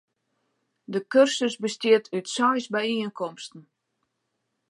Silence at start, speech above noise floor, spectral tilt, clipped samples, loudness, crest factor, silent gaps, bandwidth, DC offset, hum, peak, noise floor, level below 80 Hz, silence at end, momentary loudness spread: 0.9 s; 54 dB; -3.5 dB/octave; under 0.1%; -24 LUFS; 20 dB; none; 11.5 kHz; under 0.1%; none; -6 dBFS; -78 dBFS; -82 dBFS; 1.1 s; 13 LU